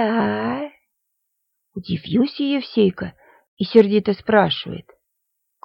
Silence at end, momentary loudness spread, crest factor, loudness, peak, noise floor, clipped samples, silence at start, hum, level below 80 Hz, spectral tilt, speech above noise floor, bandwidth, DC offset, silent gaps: 0.85 s; 18 LU; 20 dB; -19 LUFS; 0 dBFS; -75 dBFS; under 0.1%; 0 s; none; -56 dBFS; -8.5 dB/octave; 56 dB; 5.8 kHz; under 0.1%; 3.48-3.57 s